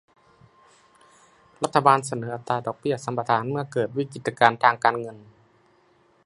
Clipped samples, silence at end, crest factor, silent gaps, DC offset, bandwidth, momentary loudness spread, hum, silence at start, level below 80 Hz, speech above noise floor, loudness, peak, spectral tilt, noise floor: under 0.1%; 1.05 s; 26 dB; none; under 0.1%; 11.5 kHz; 12 LU; none; 1.6 s; -68 dBFS; 38 dB; -23 LUFS; 0 dBFS; -5 dB/octave; -61 dBFS